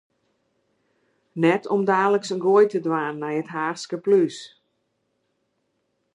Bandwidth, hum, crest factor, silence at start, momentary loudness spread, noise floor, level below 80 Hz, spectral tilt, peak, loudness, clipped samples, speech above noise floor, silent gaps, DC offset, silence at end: 10.5 kHz; none; 18 dB; 1.35 s; 10 LU; -73 dBFS; -78 dBFS; -6 dB/octave; -6 dBFS; -22 LUFS; under 0.1%; 52 dB; none; under 0.1%; 1.65 s